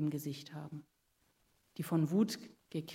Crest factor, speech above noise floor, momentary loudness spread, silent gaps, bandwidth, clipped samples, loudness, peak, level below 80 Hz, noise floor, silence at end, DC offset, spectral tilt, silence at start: 18 dB; 39 dB; 17 LU; none; 16 kHz; under 0.1%; -37 LUFS; -20 dBFS; -80 dBFS; -76 dBFS; 0 s; under 0.1%; -6.5 dB/octave; 0 s